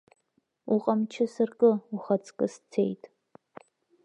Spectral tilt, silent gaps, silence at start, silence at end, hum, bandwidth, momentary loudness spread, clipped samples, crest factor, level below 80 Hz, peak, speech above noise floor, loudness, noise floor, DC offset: -7.5 dB/octave; none; 0.65 s; 1.1 s; none; 9.4 kHz; 8 LU; under 0.1%; 20 dB; -82 dBFS; -10 dBFS; 47 dB; -28 LUFS; -74 dBFS; under 0.1%